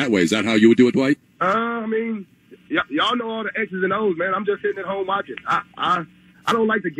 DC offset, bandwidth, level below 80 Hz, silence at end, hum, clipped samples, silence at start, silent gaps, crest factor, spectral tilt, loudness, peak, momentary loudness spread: under 0.1%; 12.5 kHz; -62 dBFS; 0.05 s; none; under 0.1%; 0 s; none; 18 dB; -5 dB/octave; -21 LUFS; -2 dBFS; 9 LU